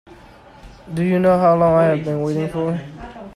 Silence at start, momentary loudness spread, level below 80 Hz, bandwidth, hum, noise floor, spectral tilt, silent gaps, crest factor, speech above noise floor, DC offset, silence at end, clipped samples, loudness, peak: 0.65 s; 15 LU; -46 dBFS; 12 kHz; none; -44 dBFS; -8.5 dB/octave; none; 16 dB; 27 dB; under 0.1%; 0.05 s; under 0.1%; -17 LUFS; -4 dBFS